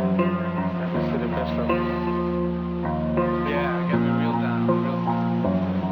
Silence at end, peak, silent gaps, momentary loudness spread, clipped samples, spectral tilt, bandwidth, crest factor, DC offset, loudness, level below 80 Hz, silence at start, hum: 0 s; -8 dBFS; none; 4 LU; under 0.1%; -10 dB/octave; 5.4 kHz; 16 dB; under 0.1%; -24 LUFS; -42 dBFS; 0 s; none